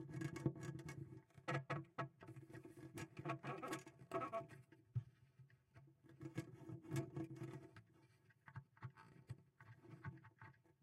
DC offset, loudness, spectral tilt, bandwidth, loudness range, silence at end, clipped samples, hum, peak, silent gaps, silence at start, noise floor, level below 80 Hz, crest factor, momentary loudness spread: under 0.1%; -52 LUFS; -6.5 dB/octave; 15.5 kHz; 7 LU; 0.1 s; under 0.1%; none; -26 dBFS; none; 0 s; -73 dBFS; -78 dBFS; 26 dB; 19 LU